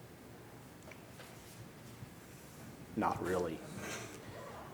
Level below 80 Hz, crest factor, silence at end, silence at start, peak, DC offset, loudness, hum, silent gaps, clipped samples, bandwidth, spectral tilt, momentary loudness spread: -66 dBFS; 22 dB; 0 s; 0 s; -22 dBFS; under 0.1%; -43 LUFS; none; none; under 0.1%; over 20 kHz; -5 dB/octave; 17 LU